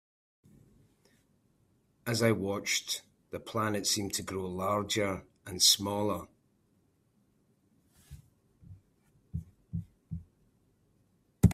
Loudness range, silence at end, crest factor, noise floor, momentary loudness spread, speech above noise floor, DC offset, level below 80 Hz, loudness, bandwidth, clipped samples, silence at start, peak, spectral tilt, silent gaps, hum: 18 LU; 0 s; 26 dB; -71 dBFS; 20 LU; 40 dB; under 0.1%; -54 dBFS; -31 LUFS; 16 kHz; under 0.1%; 2.05 s; -10 dBFS; -3.5 dB/octave; none; none